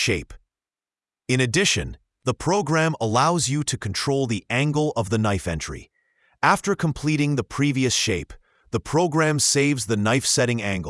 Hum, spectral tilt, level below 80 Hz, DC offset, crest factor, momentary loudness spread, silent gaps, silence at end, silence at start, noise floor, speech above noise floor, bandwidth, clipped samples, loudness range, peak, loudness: none; -4 dB/octave; -48 dBFS; under 0.1%; 20 dB; 10 LU; none; 0 s; 0 s; under -90 dBFS; over 68 dB; 12 kHz; under 0.1%; 2 LU; -4 dBFS; -22 LUFS